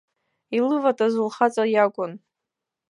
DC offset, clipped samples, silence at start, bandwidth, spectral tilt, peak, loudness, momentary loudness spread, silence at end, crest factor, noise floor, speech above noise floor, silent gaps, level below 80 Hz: under 0.1%; under 0.1%; 0.5 s; 11 kHz; -5.5 dB/octave; -4 dBFS; -22 LUFS; 9 LU; 0.75 s; 18 dB; -85 dBFS; 64 dB; none; -80 dBFS